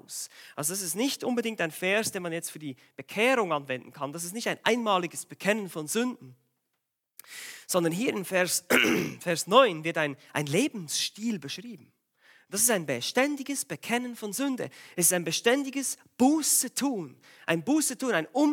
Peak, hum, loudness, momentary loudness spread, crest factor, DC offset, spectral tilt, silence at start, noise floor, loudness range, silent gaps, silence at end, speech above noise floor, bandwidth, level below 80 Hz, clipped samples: -6 dBFS; none; -27 LUFS; 14 LU; 22 dB; under 0.1%; -3 dB/octave; 0.1 s; -82 dBFS; 5 LU; none; 0 s; 54 dB; 17.5 kHz; -80 dBFS; under 0.1%